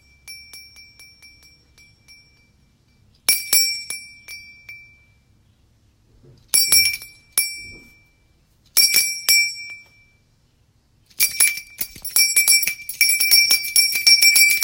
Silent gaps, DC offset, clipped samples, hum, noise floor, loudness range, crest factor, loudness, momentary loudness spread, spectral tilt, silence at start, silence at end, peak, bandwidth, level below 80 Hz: none; under 0.1%; under 0.1%; none; -60 dBFS; 8 LU; 22 dB; -15 LUFS; 21 LU; 3.5 dB/octave; 0.25 s; 0 s; 0 dBFS; 17 kHz; -58 dBFS